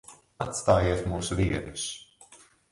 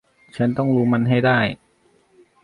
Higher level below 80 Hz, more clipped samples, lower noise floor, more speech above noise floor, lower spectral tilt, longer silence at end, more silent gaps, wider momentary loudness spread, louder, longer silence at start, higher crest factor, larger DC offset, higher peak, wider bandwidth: first, -42 dBFS vs -56 dBFS; neither; second, -55 dBFS vs -59 dBFS; second, 28 dB vs 41 dB; second, -5 dB/octave vs -8.5 dB/octave; second, 0.35 s vs 0.9 s; neither; second, 12 LU vs 15 LU; second, -28 LUFS vs -19 LUFS; second, 0.1 s vs 0.35 s; about the same, 22 dB vs 18 dB; neither; second, -8 dBFS vs -4 dBFS; first, 11.5 kHz vs 10 kHz